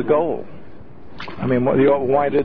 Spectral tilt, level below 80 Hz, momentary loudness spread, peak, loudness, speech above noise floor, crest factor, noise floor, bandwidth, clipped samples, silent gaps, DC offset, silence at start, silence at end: -10 dB/octave; -50 dBFS; 19 LU; -4 dBFS; -18 LUFS; 24 dB; 16 dB; -41 dBFS; 5.4 kHz; under 0.1%; none; 2%; 0 s; 0 s